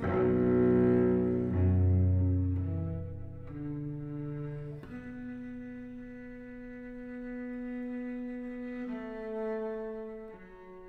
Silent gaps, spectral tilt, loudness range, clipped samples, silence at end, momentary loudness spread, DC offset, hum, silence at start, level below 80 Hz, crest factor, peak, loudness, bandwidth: none; -11.5 dB/octave; 14 LU; under 0.1%; 0 s; 19 LU; under 0.1%; none; 0 s; -52 dBFS; 18 dB; -14 dBFS; -32 LUFS; 3.9 kHz